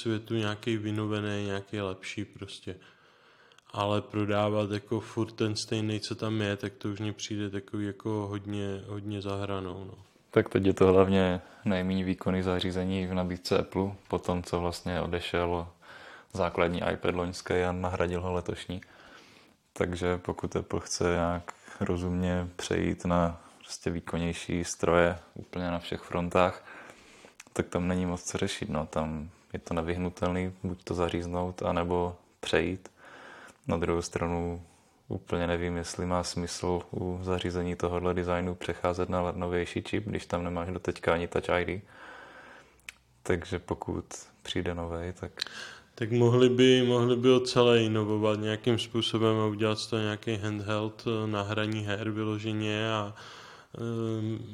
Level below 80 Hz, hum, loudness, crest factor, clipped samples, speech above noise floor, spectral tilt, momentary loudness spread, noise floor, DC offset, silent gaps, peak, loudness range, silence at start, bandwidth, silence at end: -58 dBFS; none; -30 LUFS; 24 dB; under 0.1%; 30 dB; -5.5 dB/octave; 15 LU; -60 dBFS; under 0.1%; none; -6 dBFS; 8 LU; 0 s; 13.5 kHz; 0 s